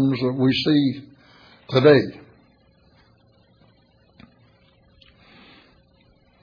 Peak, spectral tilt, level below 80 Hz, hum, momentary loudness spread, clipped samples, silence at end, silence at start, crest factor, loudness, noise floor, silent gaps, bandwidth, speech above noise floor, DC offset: -4 dBFS; -8 dB/octave; -60 dBFS; none; 13 LU; under 0.1%; 4.3 s; 0 s; 20 dB; -19 LUFS; -58 dBFS; none; 5.2 kHz; 40 dB; under 0.1%